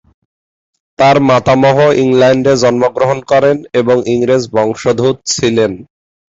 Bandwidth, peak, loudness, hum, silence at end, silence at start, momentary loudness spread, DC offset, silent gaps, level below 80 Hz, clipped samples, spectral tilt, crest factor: 8 kHz; 0 dBFS; -11 LUFS; none; 0.45 s; 1 s; 5 LU; under 0.1%; none; -46 dBFS; under 0.1%; -5.5 dB/octave; 10 dB